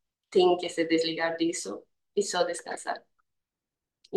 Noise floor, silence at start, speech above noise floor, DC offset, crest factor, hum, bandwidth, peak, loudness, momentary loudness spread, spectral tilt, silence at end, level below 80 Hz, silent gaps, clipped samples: -89 dBFS; 0.3 s; 62 dB; under 0.1%; 18 dB; none; 12.5 kHz; -12 dBFS; -28 LUFS; 13 LU; -3.5 dB/octave; 0 s; -80 dBFS; none; under 0.1%